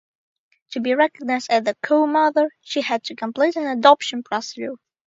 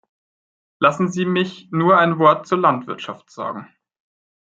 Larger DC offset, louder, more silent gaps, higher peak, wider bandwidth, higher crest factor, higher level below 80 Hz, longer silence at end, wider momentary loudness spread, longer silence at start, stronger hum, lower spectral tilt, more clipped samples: neither; second, -20 LUFS vs -17 LUFS; neither; about the same, 0 dBFS vs -2 dBFS; about the same, 7.8 kHz vs 7.8 kHz; about the same, 20 dB vs 18 dB; second, -76 dBFS vs -66 dBFS; second, 0.3 s vs 0.8 s; about the same, 13 LU vs 15 LU; about the same, 0.7 s vs 0.8 s; neither; second, -3.5 dB/octave vs -6.5 dB/octave; neither